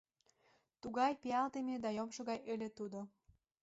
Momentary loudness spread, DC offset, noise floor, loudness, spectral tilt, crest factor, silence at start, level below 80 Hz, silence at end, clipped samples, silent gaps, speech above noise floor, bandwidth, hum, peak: 12 LU; under 0.1%; -76 dBFS; -41 LUFS; -4 dB/octave; 18 dB; 0.85 s; -78 dBFS; 0.55 s; under 0.1%; none; 36 dB; 7.6 kHz; none; -24 dBFS